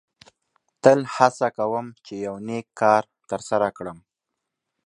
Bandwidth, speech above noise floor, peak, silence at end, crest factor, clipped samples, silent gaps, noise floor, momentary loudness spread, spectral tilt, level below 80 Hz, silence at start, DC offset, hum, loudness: 11 kHz; 61 dB; 0 dBFS; 0.9 s; 24 dB; under 0.1%; none; -83 dBFS; 14 LU; -5.5 dB/octave; -66 dBFS; 0.85 s; under 0.1%; none; -22 LUFS